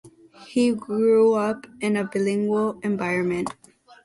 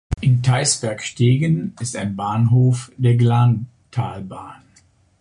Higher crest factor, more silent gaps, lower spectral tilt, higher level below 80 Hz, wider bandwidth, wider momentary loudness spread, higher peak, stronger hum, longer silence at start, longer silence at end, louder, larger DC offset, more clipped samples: about the same, 14 dB vs 14 dB; neither; about the same, -6.5 dB/octave vs -5.5 dB/octave; second, -64 dBFS vs -40 dBFS; about the same, 11.5 kHz vs 11 kHz; about the same, 10 LU vs 12 LU; second, -10 dBFS vs -4 dBFS; neither; about the same, 0.05 s vs 0.1 s; about the same, 0.55 s vs 0.65 s; second, -23 LUFS vs -19 LUFS; neither; neither